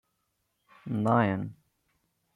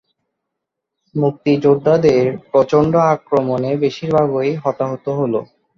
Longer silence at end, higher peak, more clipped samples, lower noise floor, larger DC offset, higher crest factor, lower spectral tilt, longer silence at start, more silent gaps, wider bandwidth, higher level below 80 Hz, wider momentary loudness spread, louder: first, 0.8 s vs 0.35 s; second, -10 dBFS vs -2 dBFS; neither; about the same, -78 dBFS vs -79 dBFS; neither; first, 22 dB vs 16 dB; about the same, -9 dB/octave vs -8 dB/octave; second, 0.85 s vs 1.15 s; neither; first, 11 kHz vs 7.2 kHz; second, -70 dBFS vs -52 dBFS; first, 17 LU vs 8 LU; second, -28 LUFS vs -16 LUFS